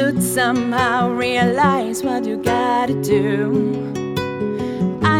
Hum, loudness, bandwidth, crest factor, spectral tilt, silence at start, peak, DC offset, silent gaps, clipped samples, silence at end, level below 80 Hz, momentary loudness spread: none; -18 LUFS; 17 kHz; 16 dB; -5.5 dB/octave; 0 s; -2 dBFS; under 0.1%; none; under 0.1%; 0 s; -50 dBFS; 6 LU